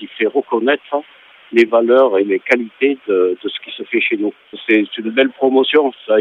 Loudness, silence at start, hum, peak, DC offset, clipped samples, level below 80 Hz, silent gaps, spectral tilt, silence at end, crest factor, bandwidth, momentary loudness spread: -15 LUFS; 0 s; none; 0 dBFS; under 0.1%; under 0.1%; -68 dBFS; none; -5.5 dB/octave; 0 s; 16 dB; 7.4 kHz; 11 LU